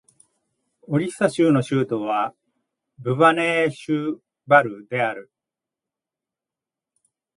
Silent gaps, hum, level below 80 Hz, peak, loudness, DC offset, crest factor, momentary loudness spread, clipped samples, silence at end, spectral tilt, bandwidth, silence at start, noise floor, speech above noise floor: none; none; -70 dBFS; -2 dBFS; -21 LUFS; under 0.1%; 22 dB; 12 LU; under 0.1%; 2.15 s; -6.5 dB/octave; 11.5 kHz; 0.9 s; -89 dBFS; 68 dB